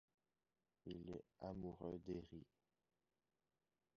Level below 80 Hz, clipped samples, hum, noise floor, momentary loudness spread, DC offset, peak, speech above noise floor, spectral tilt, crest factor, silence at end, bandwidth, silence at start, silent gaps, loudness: -72 dBFS; under 0.1%; none; under -90 dBFS; 11 LU; under 0.1%; -36 dBFS; over 37 dB; -7.5 dB/octave; 20 dB; 1.55 s; 6.8 kHz; 0.85 s; none; -54 LUFS